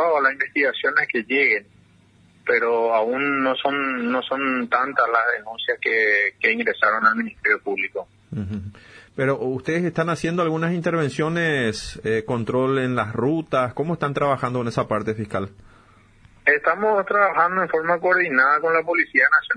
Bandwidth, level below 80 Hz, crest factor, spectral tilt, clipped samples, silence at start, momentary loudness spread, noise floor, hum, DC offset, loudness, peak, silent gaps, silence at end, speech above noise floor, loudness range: 10.5 kHz; -56 dBFS; 18 dB; -6 dB/octave; under 0.1%; 0 s; 8 LU; -55 dBFS; none; under 0.1%; -21 LUFS; -2 dBFS; none; 0 s; 33 dB; 5 LU